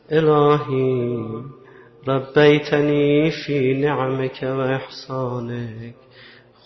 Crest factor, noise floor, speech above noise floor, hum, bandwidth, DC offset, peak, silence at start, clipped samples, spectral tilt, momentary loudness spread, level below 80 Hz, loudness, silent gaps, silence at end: 16 dB; -47 dBFS; 28 dB; none; 6.2 kHz; under 0.1%; -4 dBFS; 0.1 s; under 0.1%; -7.5 dB/octave; 16 LU; -58 dBFS; -19 LUFS; none; 0.75 s